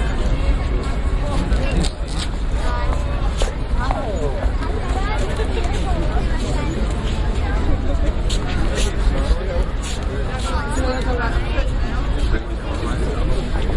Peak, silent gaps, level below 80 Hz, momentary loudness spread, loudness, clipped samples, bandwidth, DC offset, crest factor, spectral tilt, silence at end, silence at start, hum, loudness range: -4 dBFS; none; -20 dBFS; 3 LU; -22 LUFS; under 0.1%; 11.5 kHz; under 0.1%; 14 dB; -6 dB/octave; 0 s; 0 s; none; 1 LU